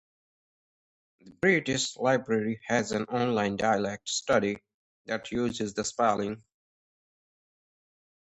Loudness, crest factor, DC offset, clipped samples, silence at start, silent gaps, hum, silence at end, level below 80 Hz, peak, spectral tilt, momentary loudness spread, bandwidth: -28 LUFS; 20 dB; under 0.1%; under 0.1%; 1.25 s; 4.74-5.05 s; none; 2 s; -62 dBFS; -10 dBFS; -4 dB/octave; 8 LU; 10.5 kHz